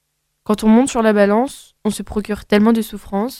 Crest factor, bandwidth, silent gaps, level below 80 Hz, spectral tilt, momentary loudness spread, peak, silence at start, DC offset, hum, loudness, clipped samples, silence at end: 16 dB; 14.5 kHz; none; -42 dBFS; -5.5 dB/octave; 11 LU; 0 dBFS; 0.5 s; under 0.1%; none; -17 LUFS; under 0.1%; 0 s